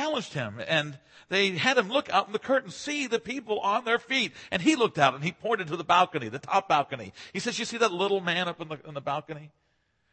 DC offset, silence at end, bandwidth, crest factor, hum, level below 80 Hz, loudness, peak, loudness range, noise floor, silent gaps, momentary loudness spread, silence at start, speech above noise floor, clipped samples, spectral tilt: under 0.1%; 0.65 s; 8.8 kHz; 22 dB; none; -70 dBFS; -27 LUFS; -6 dBFS; 3 LU; -73 dBFS; none; 11 LU; 0 s; 45 dB; under 0.1%; -4 dB/octave